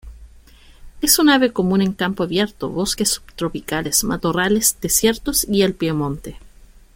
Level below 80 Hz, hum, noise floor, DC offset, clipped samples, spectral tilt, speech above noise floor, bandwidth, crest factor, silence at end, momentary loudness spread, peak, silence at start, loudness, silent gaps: -40 dBFS; none; -46 dBFS; under 0.1%; under 0.1%; -3.5 dB/octave; 27 dB; 17 kHz; 20 dB; 0.5 s; 10 LU; 0 dBFS; 0.05 s; -18 LUFS; none